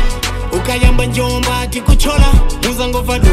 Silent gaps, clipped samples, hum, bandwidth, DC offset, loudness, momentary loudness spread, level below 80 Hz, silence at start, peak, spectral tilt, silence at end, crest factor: none; under 0.1%; none; 15.5 kHz; under 0.1%; -14 LUFS; 6 LU; -12 dBFS; 0 s; 0 dBFS; -5 dB/octave; 0 s; 10 dB